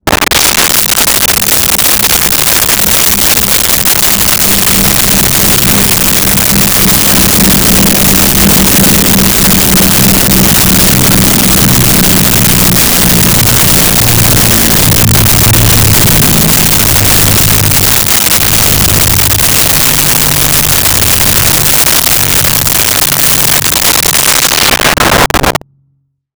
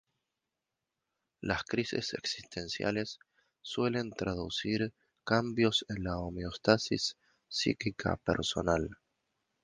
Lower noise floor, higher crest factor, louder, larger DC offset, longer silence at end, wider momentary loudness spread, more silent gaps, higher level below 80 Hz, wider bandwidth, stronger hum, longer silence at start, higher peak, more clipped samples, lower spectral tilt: second, -56 dBFS vs -88 dBFS; second, 6 dB vs 26 dB; first, -4 LUFS vs -33 LUFS; neither; first, 0.85 s vs 0.7 s; second, 1 LU vs 10 LU; neither; first, -22 dBFS vs -54 dBFS; first, over 20 kHz vs 10 kHz; neither; second, 0.05 s vs 1.4 s; first, 0 dBFS vs -8 dBFS; neither; second, -2.5 dB/octave vs -4.5 dB/octave